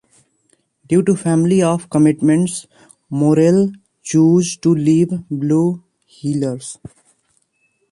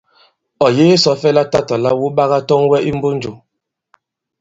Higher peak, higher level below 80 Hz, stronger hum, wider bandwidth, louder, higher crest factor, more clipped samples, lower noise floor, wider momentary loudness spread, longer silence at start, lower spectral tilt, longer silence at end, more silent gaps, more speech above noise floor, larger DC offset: about the same, -2 dBFS vs 0 dBFS; second, -58 dBFS vs -52 dBFS; neither; first, 11.5 kHz vs 7.8 kHz; about the same, -16 LUFS vs -14 LUFS; about the same, 14 dB vs 14 dB; neither; second, -64 dBFS vs -75 dBFS; first, 14 LU vs 8 LU; first, 0.9 s vs 0.6 s; first, -7 dB/octave vs -5.5 dB/octave; about the same, 1.15 s vs 1.05 s; neither; second, 49 dB vs 62 dB; neither